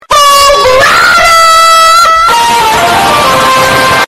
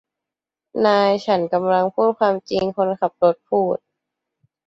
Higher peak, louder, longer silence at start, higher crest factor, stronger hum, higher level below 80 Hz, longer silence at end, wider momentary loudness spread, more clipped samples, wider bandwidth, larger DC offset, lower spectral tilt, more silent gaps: about the same, 0 dBFS vs -2 dBFS; first, -3 LUFS vs -19 LUFS; second, 0.1 s vs 0.75 s; second, 4 dB vs 18 dB; neither; first, -30 dBFS vs -62 dBFS; second, 0 s vs 0.9 s; about the same, 4 LU vs 6 LU; first, 1% vs under 0.1%; first, 16.5 kHz vs 7.8 kHz; neither; second, -1.5 dB/octave vs -6.5 dB/octave; neither